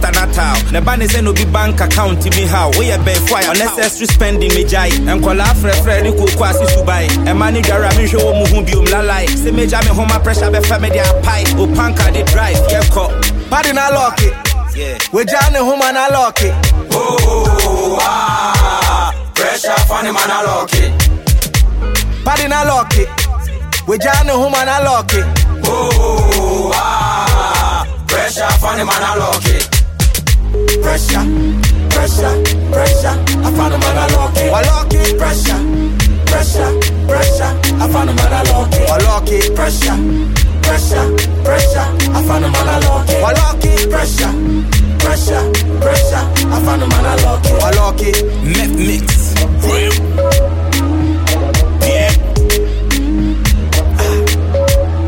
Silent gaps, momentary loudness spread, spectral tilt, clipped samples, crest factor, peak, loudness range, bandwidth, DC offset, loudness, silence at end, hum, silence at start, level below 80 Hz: none; 3 LU; -4.5 dB/octave; under 0.1%; 10 dB; 0 dBFS; 1 LU; 17 kHz; under 0.1%; -12 LUFS; 0 s; none; 0 s; -14 dBFS